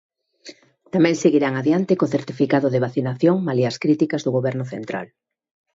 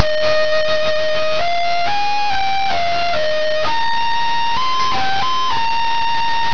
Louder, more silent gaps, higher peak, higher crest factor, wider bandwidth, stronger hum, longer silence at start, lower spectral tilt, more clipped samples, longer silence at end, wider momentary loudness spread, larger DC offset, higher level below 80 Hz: second, -20 LUFS vs -17 LUFS; neither; second, -4 dBFS vs 0 dBFS; about the same, 16 dB vs 16 dB; first, 8 kHz vs 5.4 kHz; neither; first, 0.45 s vs 0 s; first, -7 dB/octave vs -2.5 dB/octave; neither; first, 0.7 s vs 0 s; first, 11 LU vs 2 LU; second, under 0.1% vs 10%; second, -66 dBFS vs -44 dBFS